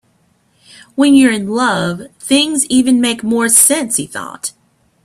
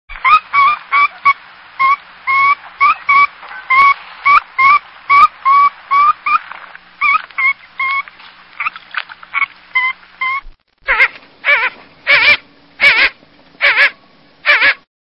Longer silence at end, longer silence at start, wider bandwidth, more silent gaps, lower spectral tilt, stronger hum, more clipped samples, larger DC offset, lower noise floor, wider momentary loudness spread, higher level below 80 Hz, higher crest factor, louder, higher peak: first, 0.55 s vs 0.25 s; first, 0.95 s vs 0.1 s; first, 16 kHz vs 11 kHz; neither; about the same, -2.5 dB/octave vs -2 dB/octave; neither; neither; second, under 0.1% vs 0.1%; first, -57 dBFS vs -47 dBFS; first, 17 LU vs 12 LU; second, -54 dBFS vs -48 dBFS; about the same, 14 dB vs 14 dB; about the same, -12 LUFS vs -12 LUFS; about the same, 0 dBFS vs 0 dBFS